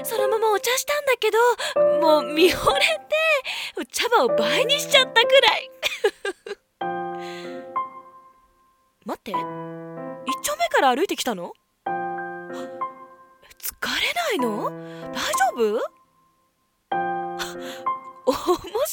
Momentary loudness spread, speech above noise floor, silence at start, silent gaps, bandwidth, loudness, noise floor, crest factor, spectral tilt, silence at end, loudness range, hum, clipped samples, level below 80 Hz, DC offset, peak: 16 LU; 47 dB; 0 s; none; 17 kHz; -22 LUFS; -68 dBFS; 20 dB; -2 dB/octave; 0 s; 12 LU; none; under 0.1%; -56 dBFS; under 0.1%; -4 dBFS